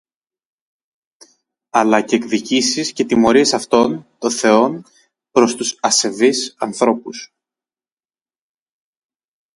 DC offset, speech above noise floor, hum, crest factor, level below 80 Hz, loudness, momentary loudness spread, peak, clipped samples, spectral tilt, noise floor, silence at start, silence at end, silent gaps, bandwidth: under 0.1%; over 74 dB; none; 18 dB; -58 dBFS; -16 LUFS; 9 LU; 0 dBFS; under 0.1%; -3 dB/octave; under -90 dBFS; 1.75 s; 2.3 s; none; 11.5 kHz